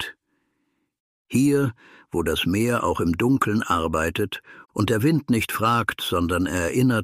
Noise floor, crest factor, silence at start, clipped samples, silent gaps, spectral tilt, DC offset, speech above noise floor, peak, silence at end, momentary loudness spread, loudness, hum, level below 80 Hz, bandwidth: -73 dBFS; 16 dB; 0 s; under 0.1%; 1.00-1.25 s; -5.5 dB/octave; under 0.1%; 51 dB; -8 dBFS; 0 s; 7 LU; -22 LUFS; none; -46 dBFS; 15.5 kHz